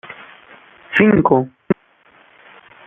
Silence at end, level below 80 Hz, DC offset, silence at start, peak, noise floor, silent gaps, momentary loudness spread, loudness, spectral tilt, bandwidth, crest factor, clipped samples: 1.15 s; -50 dBFS; under 0.1%; 0.05 s; -2 dBFS; -52 dBFS; none; 20 LU; -16 LUFS; -9 dB/octave; 3.8 kHz; 18 dB; under 0.1%